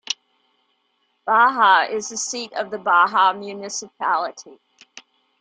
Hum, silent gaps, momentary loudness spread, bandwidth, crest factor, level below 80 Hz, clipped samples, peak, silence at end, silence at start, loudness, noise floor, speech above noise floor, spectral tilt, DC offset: none; none; 15 LU; 9.6 kHz; 18 dB; -76 dBFS; under 0.1%; -4 dBFS; 0.4 s; 0.1 s; -19 LUFS; -68 dBFS; 49 dB; -1 dB/octave; under 0.1%